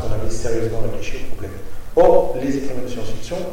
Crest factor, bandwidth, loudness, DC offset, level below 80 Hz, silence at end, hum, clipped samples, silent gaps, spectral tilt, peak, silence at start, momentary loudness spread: 16 dB; 11.5 kHz; -21 LUFS; under 0.1%; -28 dBFS; 0 s; none; under 0.1%; none; -6 dB/octave; 0 dBFS; 0 s; 18 LU